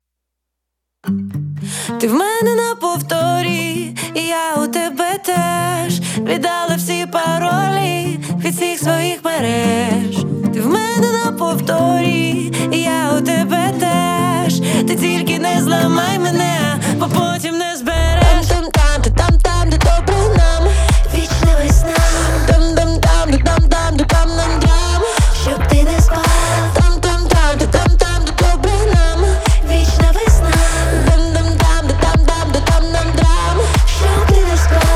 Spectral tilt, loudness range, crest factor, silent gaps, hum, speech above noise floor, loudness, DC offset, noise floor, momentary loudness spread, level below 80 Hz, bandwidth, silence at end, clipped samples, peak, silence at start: -5 dB/octave; 4 LU; 14 dB; none; none; 62 dB; -15 LUFS; under 0.1%; -77 dBFS; 5 LU; -16 dBFS; 16 kHz; 0 s; under 0.1%; 0 dBFS; 1.05 s